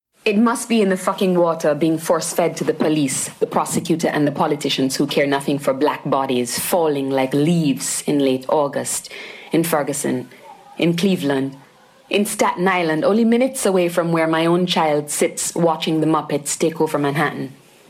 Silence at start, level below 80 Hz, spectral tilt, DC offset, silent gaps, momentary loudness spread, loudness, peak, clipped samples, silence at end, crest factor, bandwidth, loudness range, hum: 0.25 s; -64 dBFS; -4.5 dB/octave; under 0.1%; none; 5 LU; -19 LUFS; -4 dBFS; under 0.1%; 0.35 s; 14 dB; 16.5 kHz; 3 LU; none